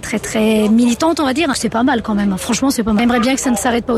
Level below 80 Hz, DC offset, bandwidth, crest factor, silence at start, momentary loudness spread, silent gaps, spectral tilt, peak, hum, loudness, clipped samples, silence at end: -40 dBFS; under 0.1%; 15 kHz; 10 dB; 0 s; 4 LU; none; -4.5 dB/octave; -4 dBFS; none; -15 LUFS; under 0.1%; 0 s